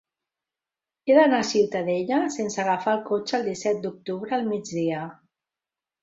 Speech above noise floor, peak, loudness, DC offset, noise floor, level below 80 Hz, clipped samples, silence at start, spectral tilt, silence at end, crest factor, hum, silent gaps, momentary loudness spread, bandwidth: 66 dB; -6 dBFS; -24 LUFS; under 0.1%; -90 dBFS; -70 dBFS; under 0.1%; 1.05 s; -5 dB/octave; 0.9 s; 20 dB; none; none; 12 LU; 8 kHz